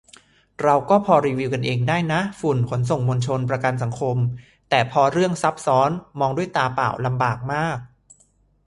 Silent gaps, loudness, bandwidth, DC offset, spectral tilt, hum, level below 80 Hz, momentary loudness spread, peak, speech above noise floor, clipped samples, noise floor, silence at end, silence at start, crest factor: none; -21 LUFS; 11.5 kHz; under 0.1%; -6.5 dB/octave; none; -54 dBFS; 6 LU; -2 dBFS; 40 dB; under 0.1%; -60 dBFS; 0.8 s; 0.6 s; 20 dB